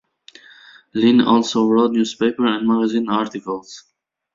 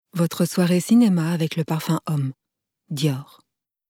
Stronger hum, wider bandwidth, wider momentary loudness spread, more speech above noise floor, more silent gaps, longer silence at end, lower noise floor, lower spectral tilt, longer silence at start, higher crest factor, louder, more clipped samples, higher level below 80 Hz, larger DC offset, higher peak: neither; second, 7.6 kHz vs 17 kHz; first, 14 LU vs 10 LU; second, 30 dB vs 51 dB; neither; about the same, 0.55 s vs 0.65 s; second, -47 dBFS vs -72 dBFS; second, -5 dB/octave vs -6.5 dB/octave; first, 0.95 s vs 0.15 s; about the same, 16 dB vs 14 dB; first, -18 LUFS vs -21 LUFS; neither; first, -62 dBFS vs -70 dBFS; neither; first, -2 dBFS vs -8 dBFS